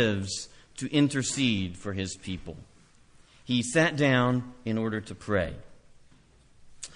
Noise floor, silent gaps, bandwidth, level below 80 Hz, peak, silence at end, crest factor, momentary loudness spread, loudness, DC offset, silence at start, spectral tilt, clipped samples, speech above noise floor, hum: -58 dBFS; none; 10.5 kHz; -52 dBFS; -10 dBFS; 0 s; 20 dB; 16 LU; -28 LUFS; under 0.1%; 0 s; -4.5 dB/octave; under 0.1%; 30 dB; none